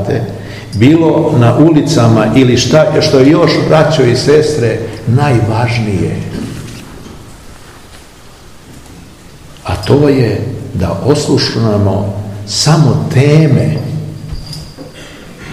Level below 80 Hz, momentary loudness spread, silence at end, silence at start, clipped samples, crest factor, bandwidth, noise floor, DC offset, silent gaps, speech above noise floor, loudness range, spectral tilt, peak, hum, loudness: -36 dBFS; 19 LU; 0 s; 0 s; 1%; 10 dB; 13 kHz; -35 dBFS; 0.6%; none; 26 dB; 12 LU; -6 dB/octave; 0 dBFS; none; -10 LUFS